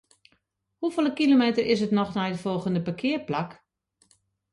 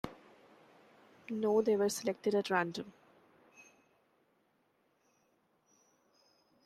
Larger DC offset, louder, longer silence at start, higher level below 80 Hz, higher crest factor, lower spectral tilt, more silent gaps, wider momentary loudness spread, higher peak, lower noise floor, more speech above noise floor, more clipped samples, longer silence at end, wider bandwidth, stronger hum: neither; first, -25 LUFS vs -34 LUFS; first, 0.8 s vs 0.05 s; first, -64 dBFS vs -74 dBFS; second, 16 dB vs 22 dB; first, -6.5 dB/octave vs -4.5 dB/octave; neither; second, 10 LU vs 18 LU; first, -10 dBFS vs -16 dBFS; second, -71 dBFS vs -75 dBFS; first, 47 dB vs 42 dB; neither; second, 1 s vs 3.75 s; second, 11.5 kHz vs 13.5 kHz; neither